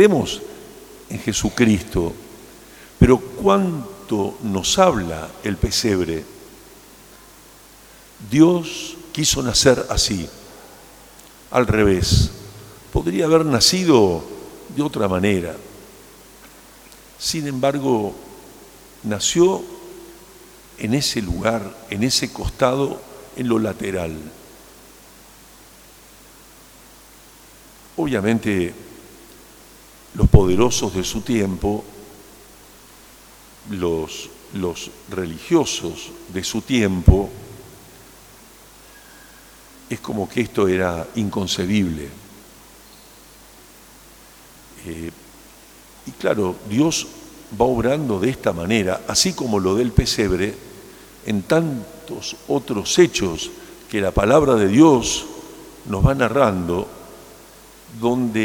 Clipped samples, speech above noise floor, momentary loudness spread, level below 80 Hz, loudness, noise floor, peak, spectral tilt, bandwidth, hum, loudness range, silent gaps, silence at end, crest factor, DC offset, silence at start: under 0.1%; 27 dB; 23 LU; -34 dBFS; -19 LUFS; -46 dBFS; 0 dBFS; -5 dB/octave; over 20 kHz; none; 10 LU; none; 0 s; 20 dB; under 0.1%; 0 s